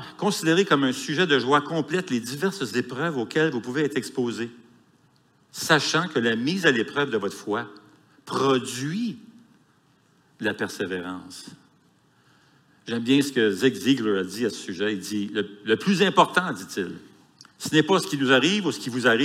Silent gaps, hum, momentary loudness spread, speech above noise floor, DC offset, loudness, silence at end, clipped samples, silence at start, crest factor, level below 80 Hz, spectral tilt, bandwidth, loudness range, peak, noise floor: none; none; 12 LU; 38 dB; under 0.1%; -24 LUFS; 0 s; under 0.1%; 0 s; 22 dB; -74 dBFS; -4.5 dB/octave; 16 kHz; 7 LU; -2 dBFS; -62 dBFS